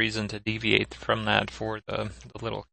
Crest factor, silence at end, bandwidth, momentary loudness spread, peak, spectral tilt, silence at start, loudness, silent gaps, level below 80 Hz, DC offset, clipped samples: 26 dB; 0.1 s; 8.8 kHz; 11 LU; -2 dBFS; -5 dB/octave; 0 s; -28 LUFS; none; -50 dBFS; under 0.1%; under 0.1%